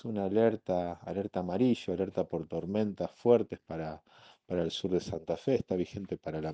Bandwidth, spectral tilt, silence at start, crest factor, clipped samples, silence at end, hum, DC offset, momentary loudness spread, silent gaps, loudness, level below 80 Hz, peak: 8.6 kHz; -7 dB/octave; 0.05 s; 20 dB; under 0.1%; 0 s; none; under 0.1%; 11 LU; none; -32 LUFS; -62 dBFS; -12 dBFS